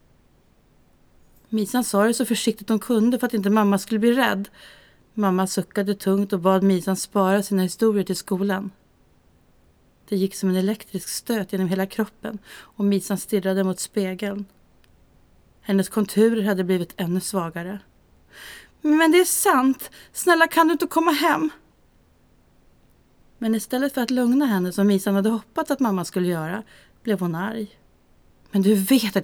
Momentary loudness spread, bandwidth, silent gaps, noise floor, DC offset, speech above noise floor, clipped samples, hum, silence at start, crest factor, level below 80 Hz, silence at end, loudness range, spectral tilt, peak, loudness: 12 LU; over 20 kHz; none; -58 dBFS; under 0.1%; 36 dB; under 0.1%; none; 1.5 s; 20 dB; -60 dBFS; 0 s; 6 LU; -5 dB/octave; -4 dBFS; -22 LUFS